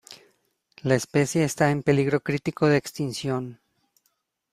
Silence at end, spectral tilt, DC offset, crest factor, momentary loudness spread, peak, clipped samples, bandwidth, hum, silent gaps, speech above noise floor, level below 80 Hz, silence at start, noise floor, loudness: 1 s; -6 dB/octave; under 0.1%; 20 dB; 9 LU; -6 dBFS; under 0.1%; 15 kHz; none; none; 50 dB; -58 dBFS; 0.1 s; -73 dBFS; -24 LUFS